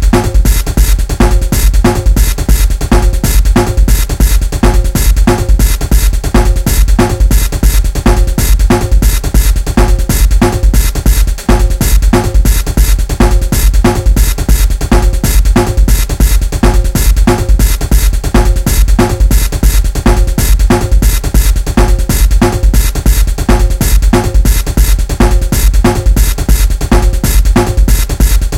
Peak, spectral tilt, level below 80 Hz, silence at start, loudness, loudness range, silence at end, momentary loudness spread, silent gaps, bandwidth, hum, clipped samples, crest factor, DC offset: 0 dBFS; -5 dB/octave; -8 dBFS; 0 s; -11 LUFS; 0 LU; 0 s; 2 LU; none; 16.5 kHz; none; 2%; 8 dB; under 0.1%